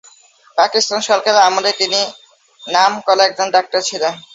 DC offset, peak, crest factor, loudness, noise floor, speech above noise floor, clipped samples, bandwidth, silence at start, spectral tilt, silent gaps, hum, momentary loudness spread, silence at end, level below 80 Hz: under 0.1%; 0 dBFS; 16 dB; -14 LUFS; -48 dBFS; 33 dB; under 0.1%; 8 kHz; 0.55 s; -0.5 dB/octave; none; none; 8 LU; 0.15 s; -68 dBFS